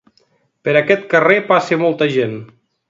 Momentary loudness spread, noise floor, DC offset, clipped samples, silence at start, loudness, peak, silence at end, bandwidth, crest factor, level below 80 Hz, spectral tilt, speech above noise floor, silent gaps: 11 LU; -59 dBFS; under 0.1%; under 0.1%; 0.65 s; -15 LUFS; 0 dBFS; 0.45 s; 7.8 kHz; 16 dB; -64 dBFS; -6 dB/octave; 45 dB; none